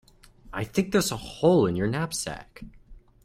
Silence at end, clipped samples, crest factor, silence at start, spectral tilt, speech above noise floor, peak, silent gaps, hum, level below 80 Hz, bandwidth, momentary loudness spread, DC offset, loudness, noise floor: 0.25 s; under 0.1%; 18 dB; 0.45 s; -5 dB/octave; 25 dB; -8 dBFS; none; none; -50 dBFS; 16 kHz; 16 LU; under 0.1%; -26 LUFS; -51 dBFS